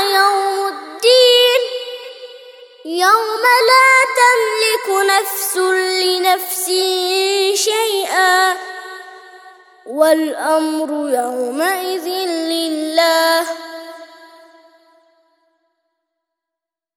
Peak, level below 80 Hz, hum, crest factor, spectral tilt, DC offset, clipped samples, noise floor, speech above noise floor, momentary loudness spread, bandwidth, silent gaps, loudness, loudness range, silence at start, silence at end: 0 dBFS; -76 dBFS; none; 16 dB; 1 dB/octave; under 0.1%; under 0.1%; -85 dBFS; 70 dB; 18 LU; over 20 kHz; none; -14 LUFS; 7 LU; 0 s; 2.7 s